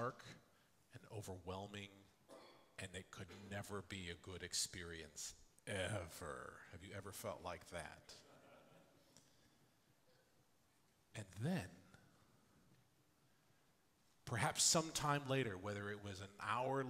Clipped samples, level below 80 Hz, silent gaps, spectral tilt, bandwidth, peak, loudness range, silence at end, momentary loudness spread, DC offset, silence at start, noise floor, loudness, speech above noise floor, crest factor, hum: under 0.1%; -76 dBFS; none; -3 dB/octave; 16 kHz; -22 dBFS; 14 LU; 0 s; 21 LU; under 0.1%; 0 s; -77 dBFS; -45 LUFS; 32 dB; 26 dB; none